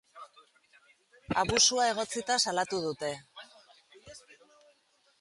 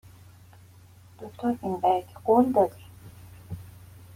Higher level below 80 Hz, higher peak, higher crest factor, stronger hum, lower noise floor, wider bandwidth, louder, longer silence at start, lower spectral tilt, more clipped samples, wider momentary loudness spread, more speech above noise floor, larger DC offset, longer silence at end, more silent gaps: about the same, -60 dBFS vs -60 dBFS; about the same, -10 dBFS vs -8 dBFS; about the same, 24 dB vs 20 dB; neither; first, -69 dBFS vs -52 dBFS; second, 11.5 kHz vs 16.5 kHz; second, -28 LUFS vs -25 LUFS; second, 0.15 s vs 1.2 s; second, -1.5 dB/octave vs -8 dB/octave; neither; about the same, 28 LU vs 27 LU; first, 40 dB vs 28 dB; neither; first, 1 s vs 0.45 s; neither